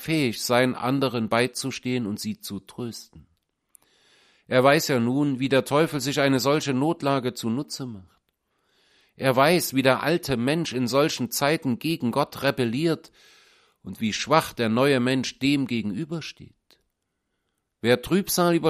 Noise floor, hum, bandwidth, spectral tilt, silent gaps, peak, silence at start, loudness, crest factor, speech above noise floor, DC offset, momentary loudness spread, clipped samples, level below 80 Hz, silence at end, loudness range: -78 dBFS; none; 15.5 kHz; -5 dB/octave; none; -2 dBFS; 0 s; -24 LUFS; 22 dB; 54 dB; under 0.1%; 12 LU; under 0.1%; -60 dBFS; 0 s; 5 LU